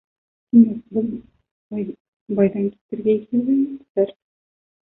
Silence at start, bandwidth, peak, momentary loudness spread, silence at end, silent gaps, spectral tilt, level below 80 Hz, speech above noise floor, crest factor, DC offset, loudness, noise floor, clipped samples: 0.55 s; 3.7 kHz; -2 dBFS; 14 LU; 0.85 s; 1.51-1.70 s, 2.00-2.26 s, 2.81-2.89 s, 3.90-3.95 s; -13 dB/octave; -62 dBFS; over 71 dB; 18 dB; under 0.1%; -21 LUFS; under -90 dBFS; under 0.1%